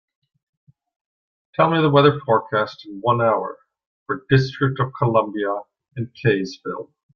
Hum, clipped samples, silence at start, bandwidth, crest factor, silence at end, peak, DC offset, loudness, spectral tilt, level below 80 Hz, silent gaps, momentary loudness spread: none; under 0.1%; 1.6 s; 6.8 kHz; 20 dB; 0.3 s; -2 dBFS; under 0.1%; -20 LUFS; -7.5 dB/octave; -56 dBFS; 3.86-4.06 s; 16 LU